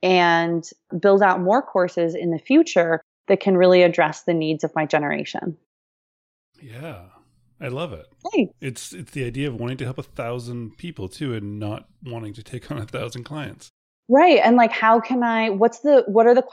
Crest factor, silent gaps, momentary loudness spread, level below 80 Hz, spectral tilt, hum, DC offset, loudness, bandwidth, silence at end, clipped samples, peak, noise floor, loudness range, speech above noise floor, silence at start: 16 dB; 3.03-3.24 s, 5.66-6.52 s, 13.70-14.03 s; 19 LU; -58 dBFS; -6 dB/octave; none; under 0.1%; -19 LUFS; 13 kHz; 0.05 s; under 0.1%; -4 dBFS; under -90 dBFS; 13 LU; over 70 dB; 0 s